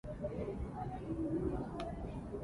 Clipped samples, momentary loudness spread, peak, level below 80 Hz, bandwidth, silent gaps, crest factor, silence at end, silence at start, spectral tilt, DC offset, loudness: under 0.1%; 6 LU; -26 dBFS; -50 dBFS; 11.5 kHz; none; 16 dB; 0 s; 0.05 s; -9 dB/octave; under 0.1%; -41 LUFS